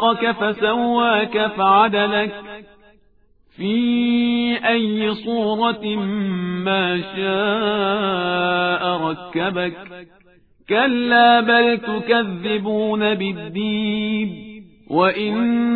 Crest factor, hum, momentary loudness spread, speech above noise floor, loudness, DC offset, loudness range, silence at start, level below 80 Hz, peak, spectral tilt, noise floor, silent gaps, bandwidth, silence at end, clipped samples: 16 dB; none; 10 LU; 39 dB; -19 LUFS; 0.1%; 4 LU; 0 s; -58 dBFS; -2 dBFS; -8.5 dB/octave; -57 dBFS; none; 4.7 kHz; 0 s; under 0.1%